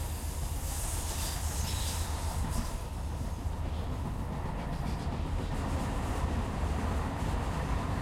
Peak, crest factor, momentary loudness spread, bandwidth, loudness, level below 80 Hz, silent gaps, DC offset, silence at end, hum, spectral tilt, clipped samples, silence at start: -20 dBFS; 14 dB; 4 LU; 16.5 kHz; -35 LUFS; -36 dBFS; none; under 0.1%; 0 s; none; -5 dB/octave; under 0.1%; 0 s